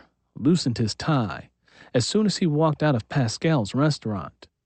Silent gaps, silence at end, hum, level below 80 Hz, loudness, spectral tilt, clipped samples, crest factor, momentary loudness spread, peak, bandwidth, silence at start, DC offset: none; 0.35 s; none; -56 dBFS; -24 LUFS; -6 dB/octave; under 0.1%; 14 dB; 10 LU; -10 dBFS; 8.8 kHz; 0.35 s; under 0.1%